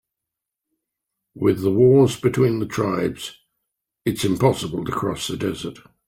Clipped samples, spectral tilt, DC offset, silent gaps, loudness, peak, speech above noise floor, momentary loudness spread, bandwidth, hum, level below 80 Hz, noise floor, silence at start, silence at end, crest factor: under 0.1%; -6.5 dB/octave; under 0.1%; none; -20 LUFS; -4 dBFS; 65 dB; 13 LU; 16.5 kHz; none; -52 dBFS; -85 dBFS; 1.35 s; 0.35 s; 18 dB